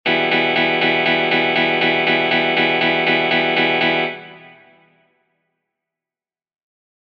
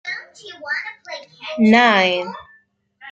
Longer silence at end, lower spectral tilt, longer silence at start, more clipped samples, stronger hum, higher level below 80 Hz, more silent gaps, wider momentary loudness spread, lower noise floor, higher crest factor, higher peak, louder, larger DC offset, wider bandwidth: first, 2.6 s vs 0 s; about the same, -6 dB/octave vs -5 dB/octave; about the same, 0.05 s vs 0.05 s; neither; neither; about the same, -62 dBFS vs -64 dBFS; neither; second, 1 LU vs 22 LU; first, under -90 dBFS vs -56 dBFS; about the same, 14 dB vs 18 dB; about the same, -4 dBFS vs -2 dBFS; about the same, -15 LUFS vs -16 LUFS; neither; second, 7 kHz vs 7.8 kHz